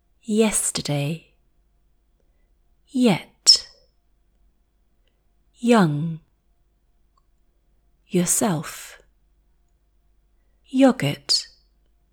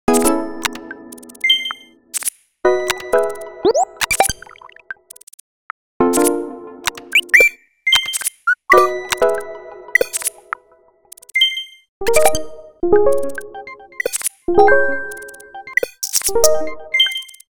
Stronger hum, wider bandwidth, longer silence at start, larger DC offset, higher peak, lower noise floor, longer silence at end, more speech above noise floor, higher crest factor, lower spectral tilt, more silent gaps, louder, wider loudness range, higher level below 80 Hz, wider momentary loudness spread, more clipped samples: neither; about the same, over 20 kHz vs over 20 kHz; first, 0.3 s vs 0.1 s; neither; about the same, 0 dBFS vs 0 dBFS; first, -64 dBFS vs -53 dBFS; first, 0.7 s vs 0 s; about the same, 43 dB vs 40 dB; first, 24 dB vs 18 dB; first, -3.5 dB/octave vs -1.5 dB/octave; second, none vs 5.23-5.27 s, 5.34-6.00 s, 11.89-12.01 s; second, -20 LUFS vs -16 LUFS; about the same, 6 LU vs 5 LU; second, -58 dBFS vs -44 dBFS; about the same, 19 LU vs 21 LU; neither